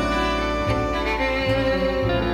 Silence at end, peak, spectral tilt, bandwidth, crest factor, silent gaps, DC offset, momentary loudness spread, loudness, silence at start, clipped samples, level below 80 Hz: 0 s; -10 dBFS; -6 dB/octave; 15.5 kHz; 12 dB; none; under 0.1%; 2 LU; -22 LUFS; 0 s; under 0.1%; -32 dBFS